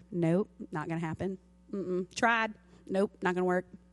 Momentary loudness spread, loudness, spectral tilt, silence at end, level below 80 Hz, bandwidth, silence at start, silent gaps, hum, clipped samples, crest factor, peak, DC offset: 11 LU; -32 LUFS; -6 dB/octave; 0.15 s; -64 dBFS; 11.5 kHz; 0.1 s; none; none; under 0.1%; 20 dB; -12 dBFS; under 0.1%